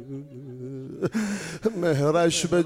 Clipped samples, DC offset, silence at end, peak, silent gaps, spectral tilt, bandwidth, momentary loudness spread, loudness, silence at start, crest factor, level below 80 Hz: under 0.1%; under 0.1%; 0 s; -10 dBFS; none; -5 dB/octave; 16 kHz; 17 LU; -25 LUFS; 0 s; 16 dB; -56 dBFS